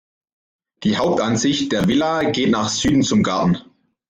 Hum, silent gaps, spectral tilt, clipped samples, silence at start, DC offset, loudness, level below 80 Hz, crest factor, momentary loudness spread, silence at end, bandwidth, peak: none; none; -4.5 dB/octave; under 0.1%; 0.8 s; under 0.1%; -18 LUFS; -48 dBFS; 12 dB; 4 LU; 0.5 s; 12 kHz; -6 dBFS